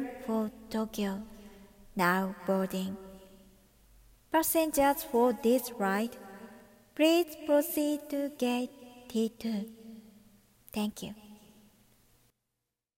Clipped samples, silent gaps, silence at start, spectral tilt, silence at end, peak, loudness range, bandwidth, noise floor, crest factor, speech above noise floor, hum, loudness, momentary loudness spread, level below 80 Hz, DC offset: under 0.1%; none; 0 s; -4.5 dB/octave; 1.6 s; -14 dBFS; 10 LU; 16.5 kHz; -86 dBFS; 20 dB; 56 dB; none; -31 LUFS; 22 LU; -62 dBFS; under 0.1%